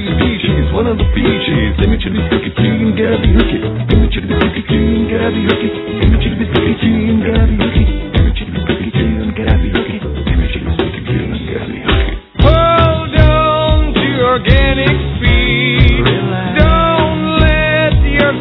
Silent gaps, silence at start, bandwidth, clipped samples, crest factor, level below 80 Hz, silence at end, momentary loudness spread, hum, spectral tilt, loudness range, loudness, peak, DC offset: none; 0 s; 5.4 kHz; 0.3%; 12 dB; -16 dBFS; 0 s; 7 LU; none; -9.5 dB/octave; 4 LU; -13 LUFS; 0 dBFS; under 0.1%